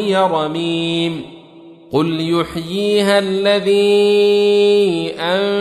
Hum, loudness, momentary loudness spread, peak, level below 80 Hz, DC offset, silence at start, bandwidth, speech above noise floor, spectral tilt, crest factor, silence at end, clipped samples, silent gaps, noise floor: none; -15 LUFS; 8 LU; -2 dBFS; -54 dBFS; under 0.1%; 0 s; 13 kHz; 26 dB; -5.5 dB/octave; 14 dB; 0 s; under 0.1%; none; -40 dBFS